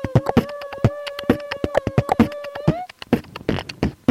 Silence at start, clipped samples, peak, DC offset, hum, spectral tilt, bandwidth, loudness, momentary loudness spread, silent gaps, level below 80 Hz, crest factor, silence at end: 0 s; under 0.1%; -2 dBFS; under 0.1%; none; -7.5 dB/octave; 15.5 kHz; -22 LUFS; 7 LU; none; -38 dBFS; 20 dB; 0.15 s